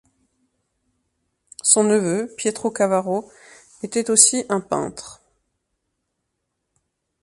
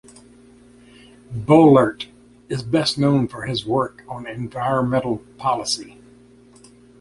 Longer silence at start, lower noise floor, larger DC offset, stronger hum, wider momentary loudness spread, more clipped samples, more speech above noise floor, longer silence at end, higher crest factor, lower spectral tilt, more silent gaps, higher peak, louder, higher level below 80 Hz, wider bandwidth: first, 1.65 s vs 1.3 s; first, -77 dBFS vs -49 dBFS; neither; second, none vs 60 Hz at -40 dBFS; second, 14 LU vs 18 LU; neither; first, 57 dB vs 30 dB; first, 2.1 s vs 1.1 s; about the same, 24 dB vs 20 dB; second, -3 dB/octave vs -6 dB/octave; neither; about the same, 0 dBFS vs -2 dBFS; about the same, -19 LUFS vs -19 LUFS; second, -64 dBFS vs -52 dBFS; about the same, 11.5 kHz vs 11.5 kHz